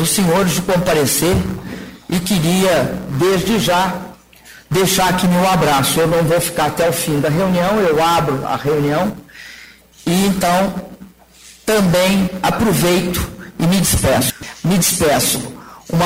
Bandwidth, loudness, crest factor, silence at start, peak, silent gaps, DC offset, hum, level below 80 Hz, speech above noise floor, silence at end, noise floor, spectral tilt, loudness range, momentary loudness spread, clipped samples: 16.5 kHz; -15 LUFS; 14 dB; 0 s; -2 dBFS; none; under 0.1%; none; -36 dBFS; 29 dB; 0 s; -43 dBFS; -4.5 dB/octave; 3 LU; 13 LU; under 0.1%